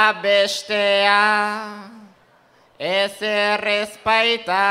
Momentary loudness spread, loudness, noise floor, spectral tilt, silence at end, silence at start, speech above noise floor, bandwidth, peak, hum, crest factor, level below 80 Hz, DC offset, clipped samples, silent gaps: 11 LU; -18 LUFS; -55 dBFS; -2 dB/octave; 0 s; 0 s; 36 dB; 15.5 kHz; 0 dBFS; none; 20 dB; -64 dBFS; under 0.1%; under 0.1%; none